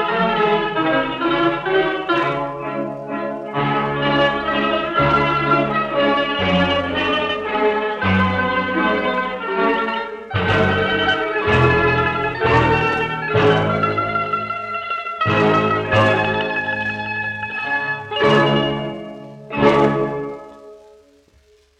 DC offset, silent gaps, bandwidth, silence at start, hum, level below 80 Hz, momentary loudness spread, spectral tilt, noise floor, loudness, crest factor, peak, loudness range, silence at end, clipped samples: under 0.1%; none; 9 kHz; 0 s; none; -44 dBFS; 9 LU; -6.5 dB/octave; -54 dBFS; -18 LUFS; 16 dB; -2 dBFS; 3 LU; 1 s; under 0.1%